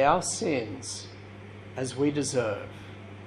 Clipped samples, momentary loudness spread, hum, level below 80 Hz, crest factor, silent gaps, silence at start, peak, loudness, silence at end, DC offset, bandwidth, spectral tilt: under 0.1%; 18 LU; none; -58 dBFS; 22 dB; none; 0 s; -8 dBFS; -29 LUFS; 0 s; under 0.1%; 12.5 kHz; -4.5 dB/octave